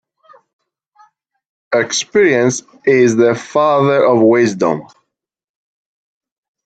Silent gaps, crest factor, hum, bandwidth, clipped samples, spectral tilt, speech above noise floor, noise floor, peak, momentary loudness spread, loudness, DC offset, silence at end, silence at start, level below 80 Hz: none; 16 dB; none; 9 kHz; under 0.1%; -5 dB/octave; 69 dB; -81 dBFS; 0 dBFS; 7 LU; -13 LUFS; under 0.1%; 1.8 s; 1.7 s; -62 dBFS